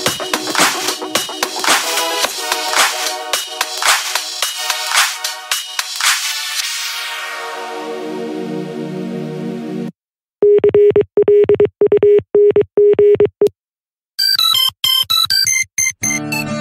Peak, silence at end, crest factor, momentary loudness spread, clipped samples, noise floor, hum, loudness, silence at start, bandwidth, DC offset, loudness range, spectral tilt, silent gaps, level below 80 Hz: 0 dBFS; 0 s; 16 dB; 13 LU; under 0.1%; under -90 dBFS; none; -14 LUFS; 0 s; 16.5 kHz; under 0.1%; 9 LU; -1.5 dB/octave; 13.59-13.64 s; -54 dBFS